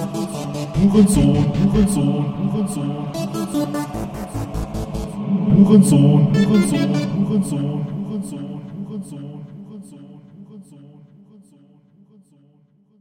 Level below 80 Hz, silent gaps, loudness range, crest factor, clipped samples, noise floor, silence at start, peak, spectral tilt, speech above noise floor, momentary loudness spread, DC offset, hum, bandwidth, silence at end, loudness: -38 dBFS; none; 18 LU; 18 dB; under 0.1%; -56 dBFS; 0 s; -2 dBFS; -7 dB/octave; 41 dB; 18 LU; under 0.1%; none; 15.5 kHz; 2.15 s; -18 LUFS